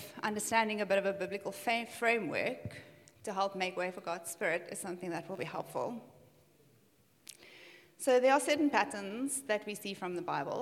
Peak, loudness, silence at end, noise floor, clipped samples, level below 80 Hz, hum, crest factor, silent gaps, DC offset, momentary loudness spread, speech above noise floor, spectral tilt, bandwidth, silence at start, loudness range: -14 dBFS; -34 LUFS; 0 s; -68 dBFS; under 0.1%; -80 dBFS; none; 22 dB; none; under 0.1%; 18 LU; 34 dB; -3.5 dB/octave; 16.5 kHz; 0 s; 8 LU